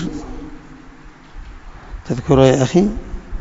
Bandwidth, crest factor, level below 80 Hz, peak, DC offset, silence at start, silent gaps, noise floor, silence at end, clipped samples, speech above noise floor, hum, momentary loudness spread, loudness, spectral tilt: 8 kHz; 18 dB; -32 dBFS; 0 dBFS; under 0.1%; 0 s; none; -40 dBFS; 0 s; under 0.1%; 26 dB; none; 24 LU; -15 LUFS; -6.5 dB/octave